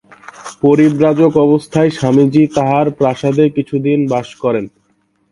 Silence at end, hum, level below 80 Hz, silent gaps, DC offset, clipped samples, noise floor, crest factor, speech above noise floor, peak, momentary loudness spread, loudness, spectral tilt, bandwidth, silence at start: 0.65 s; none; -50 dBFS; none; under 0.1%; under 0.1%; -59 dBFS; 12 dB; 48 dB; 0 dBFS; 7 LU; -13 LUFS; -7.5 dB/octave; 11.5 kHz; 0.4 s